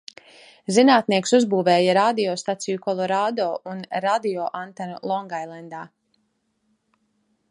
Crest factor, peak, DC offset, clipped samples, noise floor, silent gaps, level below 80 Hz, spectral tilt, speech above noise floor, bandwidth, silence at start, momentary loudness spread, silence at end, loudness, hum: 20 dB; -2 dBFS; under 0.1%; under 0.1%; -71 dBFS; none; -74 dBFS; -4.5 dB/octave; 49 dB; 11.5 kHz; 0.7 s; 17 LU; 1.65 s; -21 LUFS; none